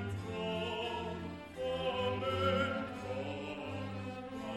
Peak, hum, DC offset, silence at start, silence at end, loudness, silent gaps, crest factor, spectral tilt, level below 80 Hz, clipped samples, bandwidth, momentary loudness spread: -20 dBFS; none; under 0.1%; 0 s; 0 s; -38 LUFS; none; 16 dB; -6 dB/octave; -60 dBFS; under 0.1%; 13.5 kHz; 10 LU